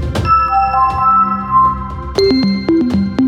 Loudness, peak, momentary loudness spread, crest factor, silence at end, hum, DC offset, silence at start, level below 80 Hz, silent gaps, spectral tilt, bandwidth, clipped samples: -13 LUFS; -2 dBFS; 4 LU; 12 dB; 0 s; none; under 0.1%; 0 s; -28 dBFS; none; -7 dB/octave; 13.5 kHz; under 0.1%